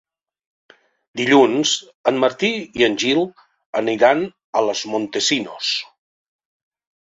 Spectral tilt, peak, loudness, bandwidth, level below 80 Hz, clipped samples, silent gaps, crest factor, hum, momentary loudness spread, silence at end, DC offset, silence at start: -3 dB/octave; -2 dBFS; -19 LUFS; 7.8 kHz; -62 dBFS; under 0.1%; 1.95-2.04 s, 3.66-3.73 s, 4.44-4.53 s; 18 dB; none; 9 LU; 1.2 s; under 0.1%; 1.15 s